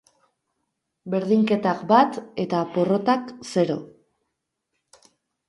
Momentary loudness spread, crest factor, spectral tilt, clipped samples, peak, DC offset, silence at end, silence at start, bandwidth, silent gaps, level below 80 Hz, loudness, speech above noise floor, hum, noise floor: 10 LU; 20 dB; -6.5 dB/octave; under 0.1%; -4 dBFS; under 0.1%; 1.6 s; 1.05 s; 11.5 kHz; none; -70 dBFS; -22 LUFS; 58 dB; none; -79 dBFS